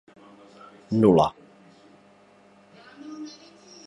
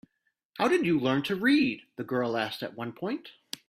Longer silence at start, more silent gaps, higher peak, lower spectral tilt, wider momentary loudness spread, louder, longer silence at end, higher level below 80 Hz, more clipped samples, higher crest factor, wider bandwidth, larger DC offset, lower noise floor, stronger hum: first, 0.9 s vs 0.55 s; neither; first, -6 dBFS vs -12 dBFS; first, -8 dB/octave vs -5.5 dB/octave; first, 26 LU vs 14 LU; first, -21 LUFS vs -28 LUFS; first, 0.55 s vs 0.4 s; first, -58 dBFS vs -70 dBFS; neither; about the same, 22 dB vs 18 dB; second, 11 kHz vs 15 kHz; neither; second, -55 dBFS vs -78 dBFS; first, 50 Hz at -60 dBFS vs none